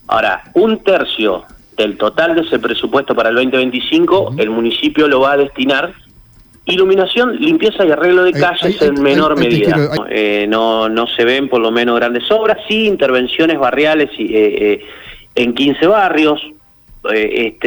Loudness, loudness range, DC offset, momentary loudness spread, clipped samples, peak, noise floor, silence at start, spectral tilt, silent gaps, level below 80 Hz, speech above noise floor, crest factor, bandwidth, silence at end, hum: -13 LUFS; 2 LU; under 0.1%; 6 LU; under 0.1%; -2 dBFS; -43 dBFS; 0.1 s; -6 dB/octave; none; -46 dBFS; 31 dB; 10 dB; over 20 kHz; 0 s; none